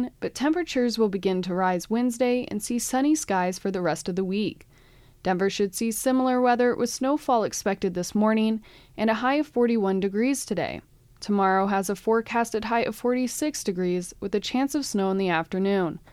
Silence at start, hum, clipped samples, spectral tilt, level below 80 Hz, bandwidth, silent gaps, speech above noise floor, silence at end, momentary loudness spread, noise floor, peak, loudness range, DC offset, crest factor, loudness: 0 s; none; under 0.1%; -5 dB/octave; -56 dBFS; 16 kHz; none; 29 dB; 0.15 s; 6 LU; -54 dBFS; -10 dBFS; 2 LU; under 0.1%; 14 dB; -25 LUFS